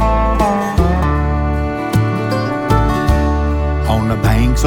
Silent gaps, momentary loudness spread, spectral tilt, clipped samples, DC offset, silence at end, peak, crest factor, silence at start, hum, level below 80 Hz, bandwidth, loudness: none; 3 LU; -7 dB/octave; under 0.1%; under 0.1%; 0 s; -2 dBFS; 12 dB; 0 s; none; -18 dBFS; 17.5 kHz; -15 LUFS